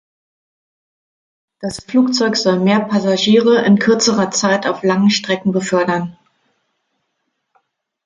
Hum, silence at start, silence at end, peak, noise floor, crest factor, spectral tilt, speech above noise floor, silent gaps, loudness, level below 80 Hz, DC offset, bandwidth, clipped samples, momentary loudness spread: none; 1.6 s; 1.95 s; -2 dBFS; -71 dBFS; 14 dB; -4.5 dB/octave; 57 dB; none; -14 LUFS; -58 dBFS; under 0.1%; 10.5 kHz; under 0.1%; 8 LU